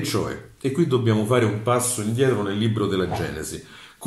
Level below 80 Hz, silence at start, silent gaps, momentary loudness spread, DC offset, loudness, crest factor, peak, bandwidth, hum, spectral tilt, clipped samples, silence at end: -50 dBFS; 0 s; none; 10 LU; under 0.1%; -23 LUFS; 16 dB; -6 dBFS; 15 kHz; none; -5.5 dB/octave; under 0.1%; 0 s